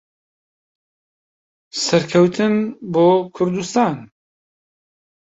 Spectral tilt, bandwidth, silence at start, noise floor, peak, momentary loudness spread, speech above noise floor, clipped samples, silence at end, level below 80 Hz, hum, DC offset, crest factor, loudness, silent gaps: -5.5 dB/octave; 8 kHz; 1.75 s; under -90 dBFS; -2 dBFS; 8 LU; over 73 dB; under 0.1%; 1.35 s; -60 dBFS; none; under 0.1%; 18 dB; -17 LUFS; none